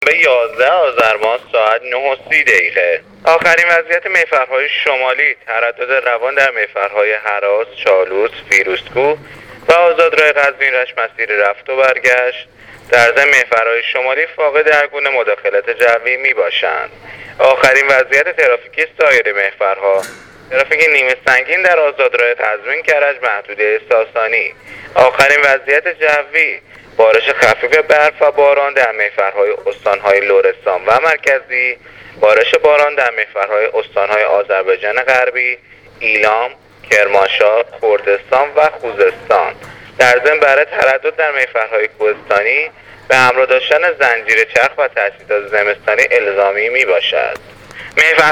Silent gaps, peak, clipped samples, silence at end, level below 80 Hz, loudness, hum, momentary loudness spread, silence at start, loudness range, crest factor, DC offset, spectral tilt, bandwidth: none; 0 dBFS; 0.2%; 0 s; -54 dBFS; -12 LUFS; none; 7 LU; 0 s; 2 LU; 12 dB; under 0.1%; -2 dB/octave; 16 kHz